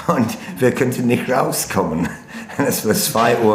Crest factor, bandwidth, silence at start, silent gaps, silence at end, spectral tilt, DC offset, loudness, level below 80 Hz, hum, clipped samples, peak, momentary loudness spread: 18 dB; 16 kHz; 0 s; none; 0 s; -4.5 dB/octave; under 0.1%; -18 LUFS; -50 dBFS; none; under 0.1%; 0 dBFS; 8 LU